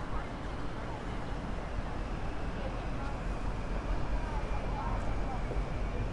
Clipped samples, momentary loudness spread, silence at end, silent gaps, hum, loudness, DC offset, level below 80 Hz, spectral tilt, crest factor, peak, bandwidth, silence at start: under 0.1%; 3 LU; 0 s; none; none; -38 LUFS; under 0.1%; -38 dBFS; -6.5 dB/octave; 12 dB; -22 dBFS; 10.5 kHz; 0 s